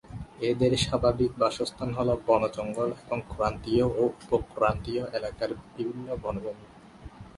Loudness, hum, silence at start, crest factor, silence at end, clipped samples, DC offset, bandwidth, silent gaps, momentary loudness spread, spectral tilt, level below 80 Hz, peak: -28 LUFS; none; 0.05 s; 20 dB; 0.05 s; under 0.1%; under 0.1%; 11.5 kHz; none; 10 LU; -6 dB/octave; -46 dBFS; -8 dBFS